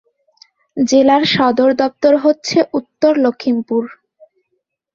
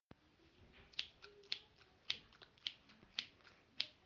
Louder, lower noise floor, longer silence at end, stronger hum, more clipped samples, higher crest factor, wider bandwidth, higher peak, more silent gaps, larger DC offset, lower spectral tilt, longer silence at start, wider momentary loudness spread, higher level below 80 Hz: first, -14 LUFS vs -48 LUFS; about the same, -71 dBFS vs -71 dBFS; first, 1.05 s vs 0 s; neither; neither; second, 14 dB vs 36 dB; about the same, 7.6 kHz vs 7.4 kHz; first, -2 dBFS vs -16 dBFS; neither; neither; first, -4.5 dB/octave vs 1.5 dB/octave; first, 0.75 s vs 0.4 s; second, 9 LU vs 21 LU; first, -58 dBFS vs -78 dBFS